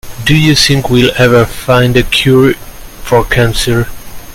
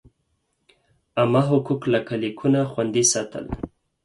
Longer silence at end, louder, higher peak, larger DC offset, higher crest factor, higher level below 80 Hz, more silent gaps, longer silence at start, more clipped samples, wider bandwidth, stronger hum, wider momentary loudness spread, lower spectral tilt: second, 0 s vs 0.35 s; first, -9 LUFS vs -22 LUFS; first, 0 dBFS vs -6 dBFS; neither; second, 10 dB vs 18 dB; first, -24 dBFS vs -50 dBFS; neither; second, 0.05 s vs 1.15 s; first, 0.3% vs under 0.1%; first, 17 kHz vs 11.5 kHz; neither; second, 7 LU vs 13 LU; about the same, -5 dB/octave vs -4.5 dB/octave